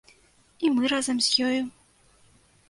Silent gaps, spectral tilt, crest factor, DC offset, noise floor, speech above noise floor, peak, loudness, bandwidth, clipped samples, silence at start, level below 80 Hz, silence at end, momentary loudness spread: none; -1.5 dB/octave; 18 dB; under 0.1%; -60 dBFS; 36 dB; -10 dBFS; -24 LUFS; 11.5 kHz; under 0.1%; 0.6 s; -66 dBFS; 1 s; 8 LU